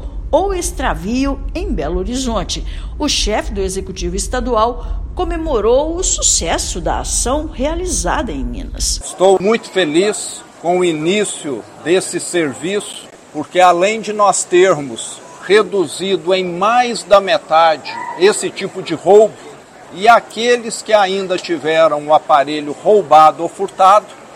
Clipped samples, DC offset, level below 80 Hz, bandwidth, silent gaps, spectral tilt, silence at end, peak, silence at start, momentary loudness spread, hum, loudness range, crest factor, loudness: 0.3%; under 0.1%; -28 dBFS; 16 kHz; none; -3.5 dB/octave; 0 s; 0 dBFS; 0 s; 12 LU; none; 5 LU; 14 dB; -15 LUFS